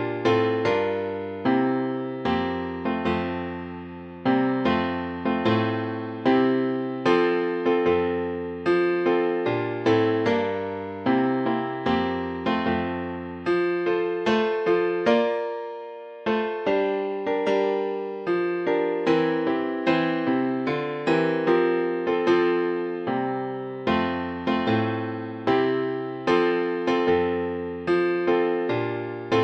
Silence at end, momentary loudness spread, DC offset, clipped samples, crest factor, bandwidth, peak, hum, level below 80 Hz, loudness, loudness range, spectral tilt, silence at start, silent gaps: 0 s; 8 LU; under 0.1%; under 0.1%; 16 dB; 7.8 kHz; -8 dBFS; none; -58 dBFS; -24 LUFS; 3 LU; -7 dB/octave; 0 s; none